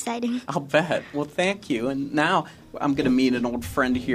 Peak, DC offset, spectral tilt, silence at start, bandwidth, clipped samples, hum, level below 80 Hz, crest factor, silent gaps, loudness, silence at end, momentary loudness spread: -4 dBFS; under 0.1%; -5.5 dB/octave; 0 s; 15 kHz; under 0.1%; none; -50 dBFS; 20 dB; none; -24 LUFS; 0 s; 7 LU